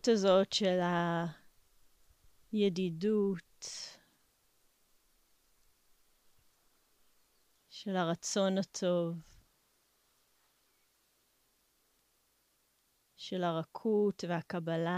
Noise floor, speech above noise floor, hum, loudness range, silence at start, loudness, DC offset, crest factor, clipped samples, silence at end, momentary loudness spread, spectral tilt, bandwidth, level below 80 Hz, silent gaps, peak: -75 dBFS; 42 dB; none; 14 LU; 0.05 s; -33 LUFS; under 0.1%; 20 dB; under 0.1%; 0 s; 15 LU; -5 dB/octave; 15 kHz; -76 dBFS; none; -16 dBFS